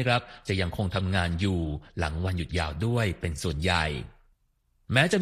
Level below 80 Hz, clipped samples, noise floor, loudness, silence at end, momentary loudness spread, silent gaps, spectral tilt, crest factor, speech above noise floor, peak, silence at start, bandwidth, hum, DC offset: -42 dBFS; under 0.1%; -70 dBFS; -28 LUFS; 0 s; 6 LU; none; -5.5 dB/octave; 22 dB; 42 dB; -6 dBFS; 0 s; 14.5 kHz; none; under 0.1%